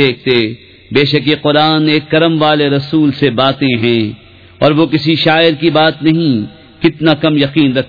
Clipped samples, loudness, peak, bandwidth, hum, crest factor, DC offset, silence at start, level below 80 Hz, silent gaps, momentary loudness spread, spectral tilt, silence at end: 0.1%; -11 LUFS; 0 dBFS; 5.4 kHz; none; 12 dB; 0.2%; 0 s; -48 dBFS; none; 5 LU; -8 dB/octave; 0 s